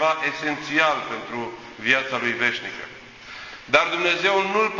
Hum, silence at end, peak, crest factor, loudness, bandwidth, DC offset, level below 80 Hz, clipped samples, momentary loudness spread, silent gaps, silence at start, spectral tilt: none; 0 s; -2 dBFS; 22 dB; -22 LUFS; 7.6 kHz; under 0.1%; -62 dBFS; under 0.1%; 17 LU; none; 0 s; -3 dB/octave